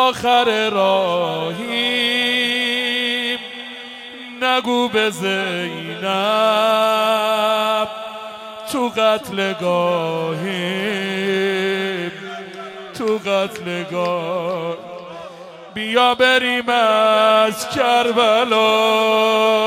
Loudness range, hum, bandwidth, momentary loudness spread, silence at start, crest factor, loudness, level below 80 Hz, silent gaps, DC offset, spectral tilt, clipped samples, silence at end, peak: 7 LU; none; 16.5 kHz; 17 LU; 0 s; 18 dB; -17 LUFS; -64 dBFS; none; under 0.1%; -3.5 dB/octave; under 0.1%; 0 s; 0 dBFS